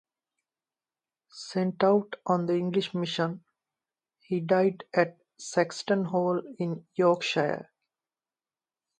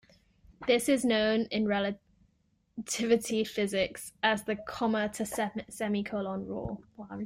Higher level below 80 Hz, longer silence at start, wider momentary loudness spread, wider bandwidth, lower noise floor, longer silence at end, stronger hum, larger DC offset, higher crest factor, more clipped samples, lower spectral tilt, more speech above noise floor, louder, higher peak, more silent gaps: second, -76 dBFS vs -60 dBFS; first, 1.35 s vs 0.5 s; second, 9 LU vs 12 LU; second, 9.8 kHz vs 16 kHz; first, under -90 dBFS vs -72 dBFS; first, 1.35 s vs 0 s; neither; neither; about the same, 20 dB vs 18 dB; neither; first, -6 dB/octave vs -4 dB/octave; first, over 63 dB vs 41 dB; first, -28 LUFS vs -31 LUFS; first, -8 dBFS vs -12 dBFS; neither